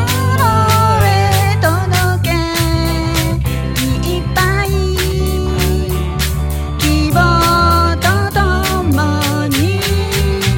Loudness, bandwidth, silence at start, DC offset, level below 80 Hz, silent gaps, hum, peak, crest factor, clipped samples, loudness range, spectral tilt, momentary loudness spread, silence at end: -14 LUFS; 17 kHz; 0 s; under 0.1%; -22 dBFS; none; none; 0 dBFS; 12 dB; under 0.1%; 3 LU; -5 dB/octave; 6 LU; 0 s